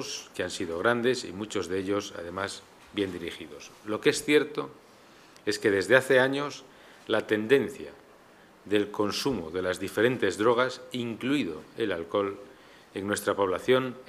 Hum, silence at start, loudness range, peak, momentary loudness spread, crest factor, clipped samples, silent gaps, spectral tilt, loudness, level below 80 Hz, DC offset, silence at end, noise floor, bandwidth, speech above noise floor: none; 0 s; 4 LU; -4 dBFS; 14 LU; 24 dB; under 0.1%; none; -4.5 dB/octave; -28 LUFS; -64 dBFS; under 0.1%; 0.05 s; -55 dBFS; 15.5 kHz; 27 dB